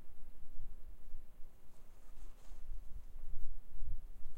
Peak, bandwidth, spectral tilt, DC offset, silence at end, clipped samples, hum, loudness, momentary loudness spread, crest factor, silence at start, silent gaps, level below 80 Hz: -20 dBFS; 1.3 kHz; -6.5 dB/octave; under 0.1%; 0 s; under 0.1%; none; -57 LUFS; 13 LU; 14 dB; 0 s; none; -44 dBFS